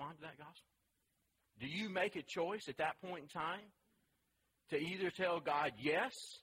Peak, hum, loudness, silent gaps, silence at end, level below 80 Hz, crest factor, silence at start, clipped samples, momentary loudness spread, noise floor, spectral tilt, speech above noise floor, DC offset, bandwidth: -24 dBFS; none; -41 LUFS; none; 0 s; -80 dBFS; 20 dB; 0 s; under 0.1%; 13 LU; -83 dBFS; -4.5 dB/octave; 42 dB; under 0.1%; 16 kHz